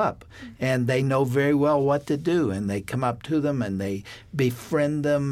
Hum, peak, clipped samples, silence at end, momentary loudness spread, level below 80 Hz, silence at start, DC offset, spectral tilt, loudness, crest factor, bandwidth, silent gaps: none; -10 dBFS; under 0.1%; 0 s; 9 LU; -54 dBFS; 0 s; under 0.1%; -7 dB/octave; -24 LUFS; 14 dB; 15.5 kHz; none